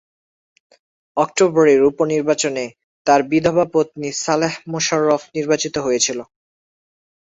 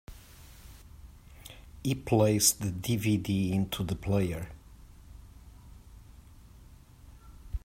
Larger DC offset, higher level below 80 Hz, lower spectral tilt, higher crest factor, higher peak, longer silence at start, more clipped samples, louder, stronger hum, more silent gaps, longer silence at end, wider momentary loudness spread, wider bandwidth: neither; second, -58 dBFS vs -48 dBFS; about the same, -4 dB/octave vs -4.5 dB/octave; about the same, 18 dB vs 22 dB; first, -2 dBFS vs -10 dBFS; first, 1.15 s vs 0.1 s; neither; first, -18 LUFS vs -29 LUFS; neither; first, 2.84-3.05 s vs none; first, 1.05 s vs 0.05 s; second, 9 LU vs 27 LU; second, 8 kHz vs 16 kHz